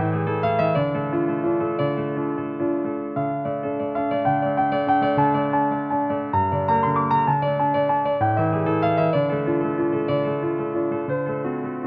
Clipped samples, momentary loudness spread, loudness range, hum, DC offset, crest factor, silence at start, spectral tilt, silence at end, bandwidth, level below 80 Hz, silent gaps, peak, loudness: under 0.1%; 6 LU; 3 LU; none; under 0.1%; 14 dB; 0 s; -10.5 dB/octave; 0 s; 5 kHz; -56 dBFS; none; -8 dBFS; -22 LUFS